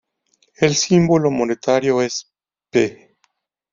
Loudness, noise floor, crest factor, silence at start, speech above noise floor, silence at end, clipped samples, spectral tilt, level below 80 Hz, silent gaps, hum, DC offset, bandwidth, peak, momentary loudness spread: -18 LUFS; -66 dBFS; 18 dB; 0.6 s; 50 dB; 0.8 s; under 0.1%; -5 dB/octave; -56 dBFS; none; none; under 0.1%; 7.6 kHz; -2 dBFS; 9 LU